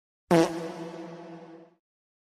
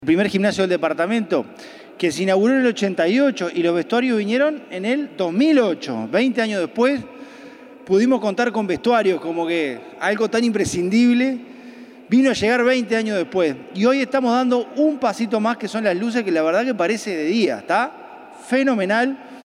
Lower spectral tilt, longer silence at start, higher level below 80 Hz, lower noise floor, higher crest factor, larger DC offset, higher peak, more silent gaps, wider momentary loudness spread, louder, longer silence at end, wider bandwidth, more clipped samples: about the same, -6 dB/octave vs -5 dB/octave; first, 0.3 s vs 0 s; second, -66 dBFS vs -60 dBFS; first, -47 dBFS vs -41 dBFS; first, 22 dB vs 14 dB; neither; second, -8 dBFS vs -4 dBFS; neither; first, 23 LU vs 7 LU; second, -27 LUFS vs -19 LUFS; first, 0.75 s vs 0.05 s; first, 15 kHz vs 12 kHz; neither